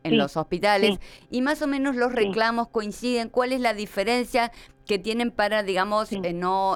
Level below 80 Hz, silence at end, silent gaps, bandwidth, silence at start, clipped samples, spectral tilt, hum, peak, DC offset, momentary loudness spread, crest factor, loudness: -52 dBFS; 0 s; none; 17.5 kHz; 0.05 s; under 0.1%; -4.5 dB/octave; none; -8 dBFS; under 0.1%; 6 LU; 16 dB; -24 LUFS